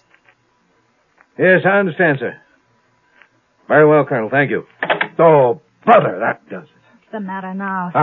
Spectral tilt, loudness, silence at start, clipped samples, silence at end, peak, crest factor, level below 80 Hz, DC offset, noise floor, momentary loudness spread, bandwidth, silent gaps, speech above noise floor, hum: -9.5 dB/octave; -15 LUFS; 1.4 s; under 0.1%; 0 s; 0 dBFS; 16 dB; -68 dBFS; under 0.1%; -59 dBFS; 16 LU; 4.1 kHz; none; 45 dB; none